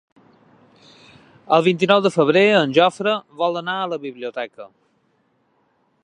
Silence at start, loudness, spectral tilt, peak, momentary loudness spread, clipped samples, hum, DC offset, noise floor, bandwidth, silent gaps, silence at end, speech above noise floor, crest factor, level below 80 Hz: 1.5 s; -18 LUFS; -5.5 dB/octave; 0 dBFS; 14 LU; under 0.1%; none; under 0.1%; -64 dBFS; 10.5 kHz; none; 1.4 s; 46 dB; 20 dB; -72 dBFS